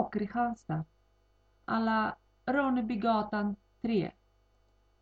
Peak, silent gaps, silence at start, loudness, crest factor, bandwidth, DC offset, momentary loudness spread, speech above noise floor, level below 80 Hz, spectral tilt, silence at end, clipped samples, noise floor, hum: -14 dBFS; none; 0 s; -32 LUFS; 20 dB; 7.2 kHz; under 0.1%; 10 LU; 37 dB; -62 dBFS; -8 dB/octave; 0.9 s; under 0.1%; -68 dBFS; 50 Hz at -55 dBFS